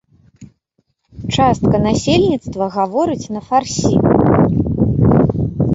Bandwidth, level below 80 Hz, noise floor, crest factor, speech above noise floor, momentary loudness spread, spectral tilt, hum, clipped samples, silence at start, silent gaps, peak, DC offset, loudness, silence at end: 8 kHz; -32 dBFS; -65 dBFS; 14 dB; 51 dB; 7 LU; -6.5 dB/octave; none; under 0.1%; 0.4 s; none; -2 dBFS; under 0.1%; -15 LUFS; 0 s